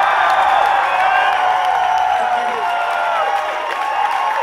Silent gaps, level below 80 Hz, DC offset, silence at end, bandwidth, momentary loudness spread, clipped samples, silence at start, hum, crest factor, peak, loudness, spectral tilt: none; -54 dBFS; under 0.1%; 0 s; 15 kHz; 5 LU; under 0.1%; 0 s; none; 14 dB; -2 dBFS; -16 LUFS; -1.5 dB/octave